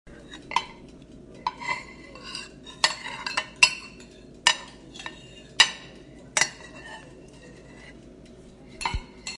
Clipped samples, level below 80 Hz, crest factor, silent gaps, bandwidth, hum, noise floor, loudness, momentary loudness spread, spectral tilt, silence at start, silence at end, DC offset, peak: under 0.1%; -48 dBFS; 30 dB; none; 11.5 kHz; none; -48 dBFS; -25 LUFS; 27 LU; 0 dB/octave; 0.05 s; 0 s; under 0.1%; 0 dBFS